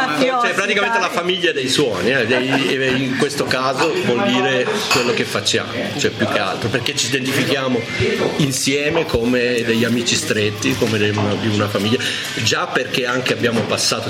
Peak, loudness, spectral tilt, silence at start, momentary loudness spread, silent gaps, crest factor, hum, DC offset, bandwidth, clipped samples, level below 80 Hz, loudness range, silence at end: -2 dBFS; -17 LUFS; -3.5 dB/octave; 0 s; 3 LU; none; 14 dB; none; under 0.1%; 16.5 kHz; under 0.1%; -48 dBFS; 1 LU; 0 s